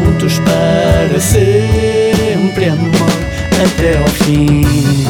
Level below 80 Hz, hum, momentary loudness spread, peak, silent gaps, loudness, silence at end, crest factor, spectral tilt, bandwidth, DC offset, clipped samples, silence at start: -22 dBFS; none; 3 LU; 0 dBFS; none; -11 LUFS; 0 s; 10 dB; -5.5 dB/octave; 19 kHz; under 0.1%; under 0.1%; 0 s